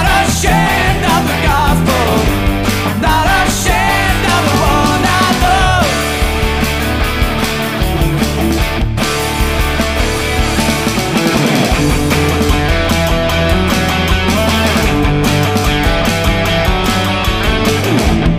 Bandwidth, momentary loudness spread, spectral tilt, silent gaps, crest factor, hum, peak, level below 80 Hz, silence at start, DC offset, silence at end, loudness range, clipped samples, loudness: 15.5 kHz; 3 LU; -4.5 dB/octave; none; 12 dB; none; 0 dBFS; -18 dBFS; 0 s; under 0.1%; 0 s; 3 LU; under 0.1%; -12 LUFS